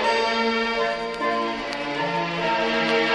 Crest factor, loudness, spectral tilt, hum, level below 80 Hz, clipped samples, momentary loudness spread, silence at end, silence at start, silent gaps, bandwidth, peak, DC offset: 18 dB; -23 LUFS; -4 dB/octave; none; -54 dBFS; under 0.1%; 5 LU; 0 s; 0 s; none; 11 kHz; -4 dBFS; under 0.1%